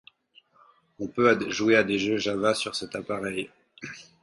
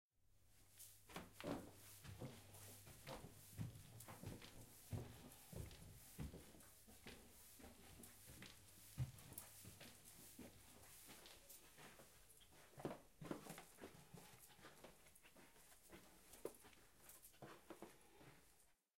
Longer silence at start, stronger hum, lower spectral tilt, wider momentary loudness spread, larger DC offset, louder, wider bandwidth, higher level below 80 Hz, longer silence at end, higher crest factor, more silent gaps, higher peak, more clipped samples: first, 1 s vs 0.05 s; neither; about the same, -4 dB/octave vs -4.5 dB/octave; first, 19 LU vs 11 LU; neither; first, -25 LUFS vs -59 LUFS; second, 11.5 kHz vs 16.5 kHz; first, -64 dBFS vs -72 dBFS; first, 0.2 s vs 0 s; about the same, 22 dB vs 26 dB; neither; first, -6 dBFS vs -32 dBFS; neither